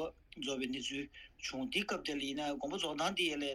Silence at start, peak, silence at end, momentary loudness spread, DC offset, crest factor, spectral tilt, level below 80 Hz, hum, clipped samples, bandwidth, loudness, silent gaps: 0 s; -20 dBFS; 0 s; 9 LU; under 0.1%; 18 dB; -3 dB/octave; -64 dBFS; none; under 0.1%; 15.5 kHz; -38 LUFS; none